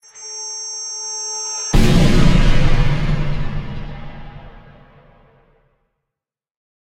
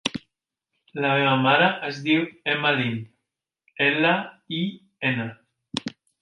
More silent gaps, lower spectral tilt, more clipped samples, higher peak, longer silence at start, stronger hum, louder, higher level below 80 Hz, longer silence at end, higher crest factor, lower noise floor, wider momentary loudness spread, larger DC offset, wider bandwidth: neither; about the same, -4.5 dB/octave vs -5.5 dB/octave; neither; first, 0 dBFS vs -4 dBFS; about the same, 0.15 s vs 0.05 s; neither; first, -19 LUFS vs -23 LUFS; first, -20 dBFS vs -68 dBFS; first, 2.35 s vs 0.35 s; second, 16 dB vs 22 dB; about the same, -85 dBFS vs -83 dBFS; first, 21 LU vs 15 LU; neither; about the same, 11 kHz vs 11.5 kHz